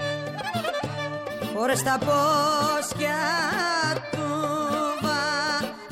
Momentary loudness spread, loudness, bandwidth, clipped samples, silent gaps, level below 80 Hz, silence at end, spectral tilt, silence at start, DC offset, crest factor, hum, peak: 8 LU; -25 LUFS; 16.5 kHz; under 0.1%; none; -58 dBFS; 0 s; -3.5 dB/octave; 0 s; under 0.1%; 12 dB; none; -12 dBFS